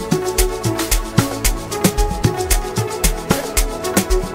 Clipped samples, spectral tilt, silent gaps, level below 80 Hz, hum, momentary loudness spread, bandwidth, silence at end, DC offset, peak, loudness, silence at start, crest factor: under 0.1%; -4 dB/octave; none; -22 dBFS; none; 3 LU; 16.5 kHz; 0 s; under 0.1%; 0 dBFS; -19 LUFS; 0 s; 18 dB